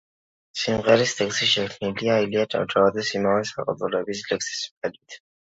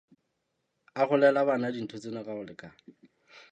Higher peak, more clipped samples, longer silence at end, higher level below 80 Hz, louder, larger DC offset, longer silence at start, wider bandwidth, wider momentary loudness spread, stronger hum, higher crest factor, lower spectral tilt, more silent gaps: first, -4 dBFS vs -10 dBFS; neither; second, 0.4 s vs 0.8 s; first, -60 dBFS vs -78 dBFS; first, -23 LUFS vs -28 LUFS; neither; second, 0.55 s vs 0.95 s; about the same, 8 kHz vs 8.6 kHz; second, 10 LU vs 20 LU; neither; about the same, 20 dB vs 22 dB; second, -3.5 dB/octave vs -6.5 dB/octave; first, 4.71-4.82 s vs none